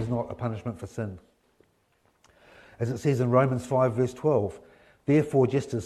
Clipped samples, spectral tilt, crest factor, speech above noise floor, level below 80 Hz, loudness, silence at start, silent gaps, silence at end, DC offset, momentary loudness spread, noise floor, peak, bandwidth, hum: under 0.1%; -8 dB/octave; 20 dB; 42 dB; -60 dBFS; -27 LUFS; 0 s; none; 0 s; under 0.1%; 13 LU; -68 dBFS; -8 dBFS; 13 kHz; none